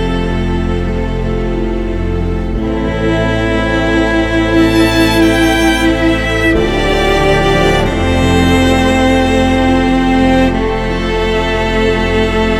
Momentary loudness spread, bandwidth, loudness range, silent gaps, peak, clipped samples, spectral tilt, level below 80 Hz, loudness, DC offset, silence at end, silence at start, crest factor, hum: 7 LU; 15.5 kHz; 4 LU; none; 0 dBFS; under 0.1%; -6 dB/octave; -20 dBFS; -12 LUFS; under 0.1%; 0 s; 0 s; 12 dB; none